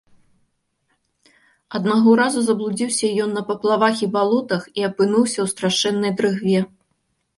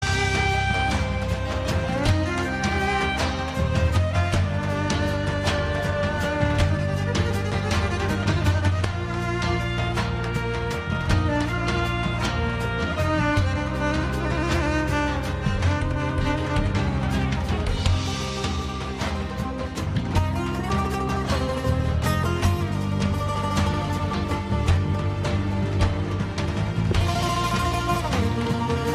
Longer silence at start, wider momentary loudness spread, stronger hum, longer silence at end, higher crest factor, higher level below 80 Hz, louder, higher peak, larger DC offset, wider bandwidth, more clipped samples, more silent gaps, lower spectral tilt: first, 1.7 s vs 0 s; first, 7 LU vs 4 LU; neither; first, 0.7 s vs 0 s; about the same, 18 dB vs 20 dB; second, -66 dBFS vs -32 dBFS; first, -19 LUFS vs -24 LUFS; about the same, -4 dBFS vs -4 dBFS; neither; second, 11.5 kHz vs 14.5 kHz; neither; neither; second, -4.5 dB/octave vs -6 dB/octave